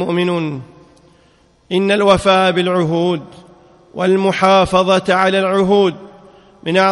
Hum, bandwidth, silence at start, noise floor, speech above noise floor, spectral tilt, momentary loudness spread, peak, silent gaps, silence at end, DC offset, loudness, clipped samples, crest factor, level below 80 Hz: none; 11.5 kHz; 0 s; -52 dBFS; 38 dB; -5.5 dB/octave; 13 LU; 0 dBFS; none; 0 s; under 0.1%; -14 LUFS; under 0.1%; 16 dB; -46 dBFS